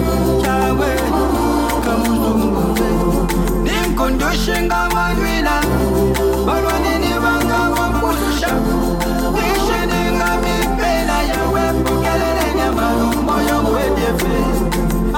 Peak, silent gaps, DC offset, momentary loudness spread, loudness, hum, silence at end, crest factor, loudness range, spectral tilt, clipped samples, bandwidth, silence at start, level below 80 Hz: -6 dBFS; none; under 0.1%; 2 LU; -16 LUFS; none; 0 s; 10 dB; 1 LU; -5 dB/octave; under 0.1%; 17 kHz; 0 s; -24 dBFS